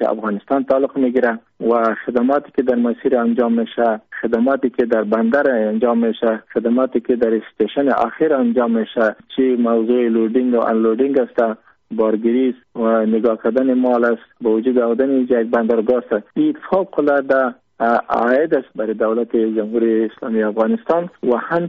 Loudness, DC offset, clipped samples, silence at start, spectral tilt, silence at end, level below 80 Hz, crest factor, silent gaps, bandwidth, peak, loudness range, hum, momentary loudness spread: -17 LUFS; under 0.1%; under 0.1%; 0 s; -5 dB/octave; 0 s; -62 dBFS; 12 dB; none; 4.7 kHz; -4 dBFS; 1 LU; none; 4 LU